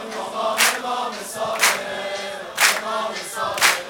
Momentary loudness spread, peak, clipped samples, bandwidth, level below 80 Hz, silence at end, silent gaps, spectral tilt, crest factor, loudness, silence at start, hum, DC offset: 10 LU; 0 dBFS; under 0.1%; over 20 kHz; -64 dBFS; 0 s; none; 0 dB/octave; 22 dB; -21 LUFS; 0 s; none; under 0.1%